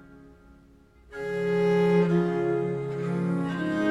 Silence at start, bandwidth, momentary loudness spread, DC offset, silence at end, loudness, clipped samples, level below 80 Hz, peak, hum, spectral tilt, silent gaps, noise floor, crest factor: 0.05 s; 9.6 kHz; 9 LU; under 0.1%; 0 s; -26 LUFS; under 0.1%; -58 dBFS; -12 dBFS; none; -8 dB/octave; none; -55 dBFS; 14 dB